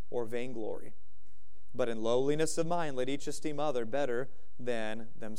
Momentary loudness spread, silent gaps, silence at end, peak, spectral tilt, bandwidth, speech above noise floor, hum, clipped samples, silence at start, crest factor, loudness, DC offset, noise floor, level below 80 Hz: 12 LU; none; 0 s; -16 dBFS; -5 dB/octave; 15.5 kHz; 32 dB; none; under 0.1%; 0.1 s; 18 dB; -35 LUFS; 3%; -66 dBFS; -66 dBFS